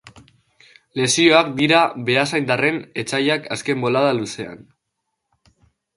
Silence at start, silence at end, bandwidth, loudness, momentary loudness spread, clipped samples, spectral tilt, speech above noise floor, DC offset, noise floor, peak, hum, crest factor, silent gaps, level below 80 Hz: 0.05 s; 1.4 s; 11.5 kHz; -18 LUFS; 13 LU; under 0.1%; -4 dB/octave; 58 dB; under 0.1%; -77 dBFS; 0 dBFS; none; 20 dB; none; -62 dBFS